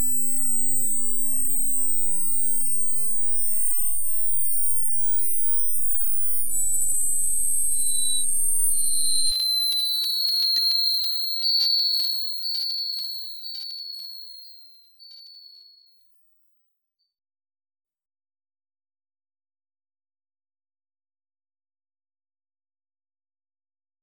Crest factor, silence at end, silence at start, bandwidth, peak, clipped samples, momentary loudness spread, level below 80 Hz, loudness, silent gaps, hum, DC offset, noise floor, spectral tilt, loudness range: 14 dB; 5.95 s; 0 s; over 20 kHz; -10 dBFS; under 0.1%; 11 LU; -58 dBFS; -21 LUFS; none; none; under 0.1%; -77 dBFS; 1 dB/octave; 11 LU